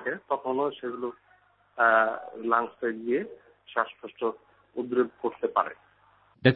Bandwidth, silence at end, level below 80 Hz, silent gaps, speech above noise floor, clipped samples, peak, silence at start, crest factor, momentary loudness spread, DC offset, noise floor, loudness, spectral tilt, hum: 4.9 kHz; 0 s; -72 dBFS; none; 34 dB; under 0.1%; -4 dBFS; 0 s; 24 dB; 13 LU; under 0.1%; -62 dBFS; -28 LUFS; -10 dB/octave; 50 Hz at -75 dBFS